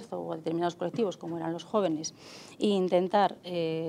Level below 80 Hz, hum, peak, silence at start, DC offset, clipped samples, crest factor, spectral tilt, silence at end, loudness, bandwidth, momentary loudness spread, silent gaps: -78 dBFS; none; -14 dBFS; 0 s; under 0.1%; under 0.1%; 16 dB; -5.5 dB/octave; 0 s; -30 LUFS; 13 kHz; 11 LU; none